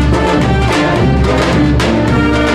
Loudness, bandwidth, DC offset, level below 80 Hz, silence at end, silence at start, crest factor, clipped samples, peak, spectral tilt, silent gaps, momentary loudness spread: -11 LUFS; 12.5 kHz; 0.2%; -18 dBFS; 0 s; 0 s; 8 dB; under 0.1%; -2 dBFS; -6.5 dB/octave; none; 1 LU